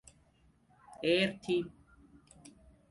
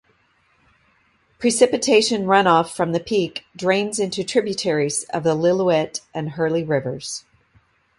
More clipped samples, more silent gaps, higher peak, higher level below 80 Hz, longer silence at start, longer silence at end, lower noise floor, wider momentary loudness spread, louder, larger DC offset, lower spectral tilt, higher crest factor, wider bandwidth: neither; neither; second, -18 dBFS vs 0 dBFS; second, -66 dBFS vs -60 dBFS; second, 1 s vs 1.4 s; second, 0.4 s vs 0.8 s; first, -68 dBFS vs -62 dBFS; about the same, 9 LU vs 11 LU; second, -32 LUFS vs -20 LUFS; neither; about the same, -5 dB/octave vs -4 dB/octave; about the same, 20 dB vs 20 dB; about the same, 11.5 kHz vs 11.5 kHz